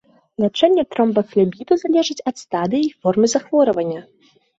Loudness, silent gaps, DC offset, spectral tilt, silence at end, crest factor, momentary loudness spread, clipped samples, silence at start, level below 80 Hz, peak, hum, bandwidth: -18 LUFS; none; under 0.1%; -5.5 dB/octave; 0.55 s; 16 dB; 8 LU; under 0.1%; 0.4 s; -62 dBFS; -2 dBFS; none; 8 kHz